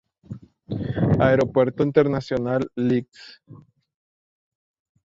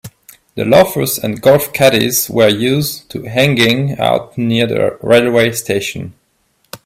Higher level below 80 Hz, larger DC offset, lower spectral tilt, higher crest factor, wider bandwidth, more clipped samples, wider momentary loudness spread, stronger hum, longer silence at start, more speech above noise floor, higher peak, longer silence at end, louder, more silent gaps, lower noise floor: about the same, -48 dBFS vs -48 dBFS; neither; first, -8.5 dB/octave vs -4.5 dB/octave; first, 20 dB vs 14 dB; second, 7.6 kHz vs 16.5 kHz; neither; first, 23 LU vs 10 LU; neither; first, 0.3 s vs 0.05 s; second, 19 dB vs 47 dB; second, -4 dBFS vs 0 dBFS; first, 1.55 s vs 0.1 s; second, -21 LUFS vs -13 LUFS; neither; second, -41 dBFS vs -60 dBFS